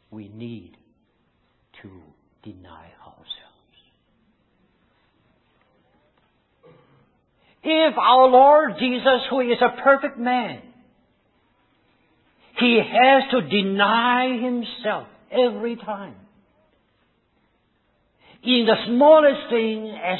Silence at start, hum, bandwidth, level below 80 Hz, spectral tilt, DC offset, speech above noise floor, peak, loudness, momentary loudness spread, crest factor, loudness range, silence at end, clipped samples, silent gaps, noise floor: 0.1 s; none; 4.3 kHz; -64 dBFS; -9.5 dB/octave; under 0.1%; 47 dB; -2 dBFS; -18 LUFS; 24 LU; 20 dB; 11 LU; 0 s; under 0.1%; none; -66 dBFS